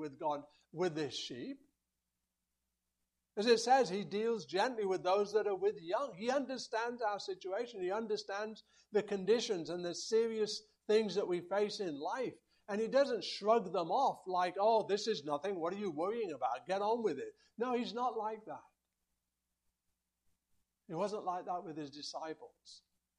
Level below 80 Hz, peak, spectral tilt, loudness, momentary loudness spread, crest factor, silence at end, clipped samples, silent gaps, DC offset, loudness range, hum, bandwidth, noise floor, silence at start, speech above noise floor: -84 dBFS; -16 dBFS; -4 dB/octave; -36 LUFS; 12 LU; 20 dB; 0.4 s; under 0.1%; none; under 0.1%; 10 LU; none; 11 kHz; -88 dBFS; 0 s; 52 dB